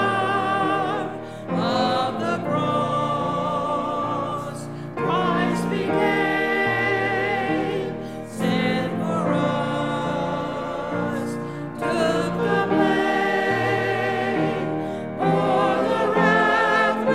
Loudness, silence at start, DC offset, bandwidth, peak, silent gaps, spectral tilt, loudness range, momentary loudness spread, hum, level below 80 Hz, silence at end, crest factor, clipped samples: -22 LUFS; 0 s; 0.3%; 14.5 kHz; -6 dBFS; none; -6 dB/octave; 3 LU; 9 LU; none; -56 dBFS; 0 s; 16 dB; under 0.1%